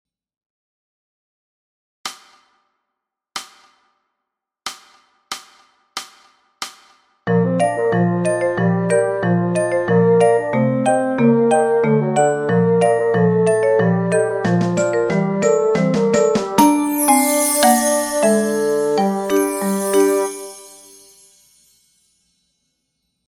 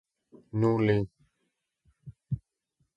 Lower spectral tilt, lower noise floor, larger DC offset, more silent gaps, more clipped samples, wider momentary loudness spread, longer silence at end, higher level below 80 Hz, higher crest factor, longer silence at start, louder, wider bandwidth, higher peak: second, -5.5 dB/octave vs -9 dB/octave; about the same, -81 dBFS vs -80 dBFS; neither; neither; neither; first, 17 LU vs 13 LU; first, 2.6 s vs 0.6 s; about the same, -60 dBFS vs -56 dBFS; about the same, 18 dB vs 20 dB; first, 2.05 s vs 0.55 s; first, -16 LUFS vs -29 LUFS; first, 17 kHz vs 7.6 kHz; first, 0 dBFS vs -12 dBFS